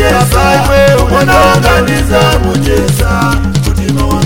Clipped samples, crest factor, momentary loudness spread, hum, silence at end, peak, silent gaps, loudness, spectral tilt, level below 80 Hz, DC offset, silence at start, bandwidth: 0.7%; 8 dB; 5 LU; none; 0 s; 0 dBFS; none; -8 LUFS; -5.5 dB/octave; -16 dBFS; 3%; 0 s; 17.5 kHz